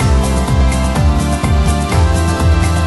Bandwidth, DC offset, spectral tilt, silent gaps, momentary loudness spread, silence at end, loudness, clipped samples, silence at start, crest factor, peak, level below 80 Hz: 12 kHz; under 0.1%; -6 dB/octave; none; 1 LU; 0 s; -14 LUFS; under 0.1%; 0 s; 10 dB; 0 dBFS; -16 dBFS